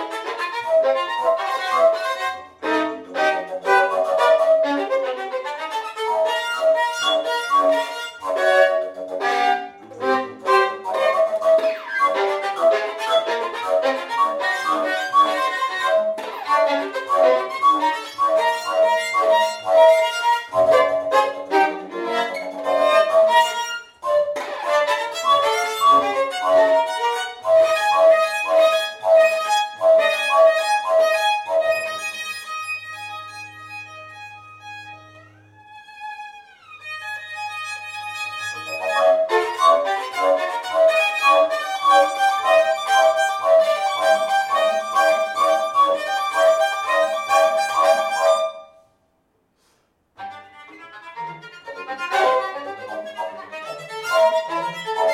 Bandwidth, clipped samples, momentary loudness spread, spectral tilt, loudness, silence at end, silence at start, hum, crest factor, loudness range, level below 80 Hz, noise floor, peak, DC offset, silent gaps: 16 kHz; under 0.1%; 15 LU; -1.5 dB/octave; -19 LUFS; 0 s; 0 s; none; 18 dB; 11 LU; -70 dBFS; -66 dBFS; -2 dBFS; under 0.1%; none